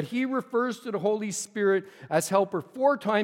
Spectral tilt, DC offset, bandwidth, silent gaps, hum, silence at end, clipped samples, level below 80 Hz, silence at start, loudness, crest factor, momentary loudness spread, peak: -4.5 dB/octave; under 0.1%; 16.5 kHz; none; none; 0 s; under 0.1%; -80 dBFS; 0 s; -27 LUFS; 18 dB; 5 LU; -8 dBFS